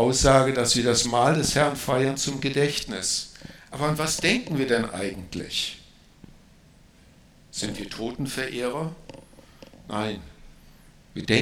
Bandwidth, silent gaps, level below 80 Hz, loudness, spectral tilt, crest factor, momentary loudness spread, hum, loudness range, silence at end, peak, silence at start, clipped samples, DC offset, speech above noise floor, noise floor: 18 kHz; none; -44 dBFS; -24 LUFS; -3.5 dB/octave; 22 dB; 15 LU; none; 10 LU; 0 s; -4 dBFS; 0 s; under 0.1%; under 0.1%; 29 dB; -54 dBFS